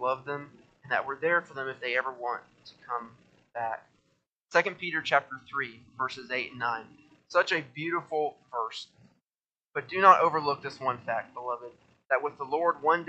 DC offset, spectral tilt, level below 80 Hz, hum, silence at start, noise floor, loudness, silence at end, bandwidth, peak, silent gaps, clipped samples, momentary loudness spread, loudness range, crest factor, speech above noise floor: under 0.1%; -4.5 dB/octave; -78 dBFS; none; 0 s; under -90 dBFS; -29 LUFS; 0 s; 8.4 kHz; -4 dBFS; 4.32-4.48 s, 9.35-9.39 s; under 0.1%; 12 LU; 6 LU; 26 dB; over 61 dB